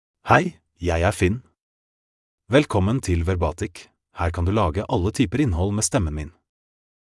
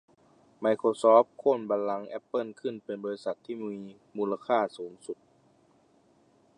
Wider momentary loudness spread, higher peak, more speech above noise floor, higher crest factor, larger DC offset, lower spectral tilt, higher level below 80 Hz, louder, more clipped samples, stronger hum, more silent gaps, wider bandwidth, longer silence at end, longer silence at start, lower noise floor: second, 13 LU vs 20 LU; first, -2 dBFS vs -8 dBFS; first, over 69 dB vs 36 dB; about the same, 22 dB vs 22 dB; neither; about the same, -5.5 dB/octave vs -6 dB/octave; first, -40 dBFS vs -84 dBFS; first, -22 LUFS vs -29 LUFS; neither; neither; first, 1.61-2.38 s vs none; first, 12 kHz vs 10.5 kHz; second, 0.9 s vs 1.45 s; second, 0.25 s vs 0.6 s; first, under -90 dBFS vs -64 dBFS